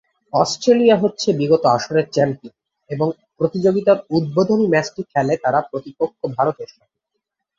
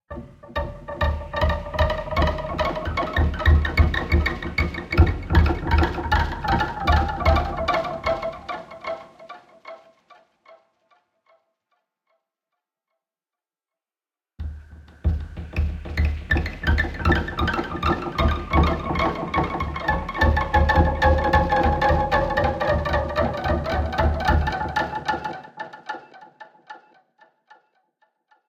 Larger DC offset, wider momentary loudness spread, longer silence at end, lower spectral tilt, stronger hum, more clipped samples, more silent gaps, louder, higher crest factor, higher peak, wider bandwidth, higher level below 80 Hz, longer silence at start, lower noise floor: neither; second, 9 LU vs 15 LU; second, 0.95 s vs 1.7 s; about the same, -6 dB/octave vs -7 dB/octave; neither; neither; neither; first, -18 LUFS vs -23 LUFS; about the same, 16 dB vs 20 dB; about the same, -2 dBFS vs -4 dBFS; about the same, 8 kHz vs 7.6 kHz; second, -60 dBFS vs -28 dBFS; first, 0.35 s vs 0.1 s; second, -78 dBFS vs under -90 dBFS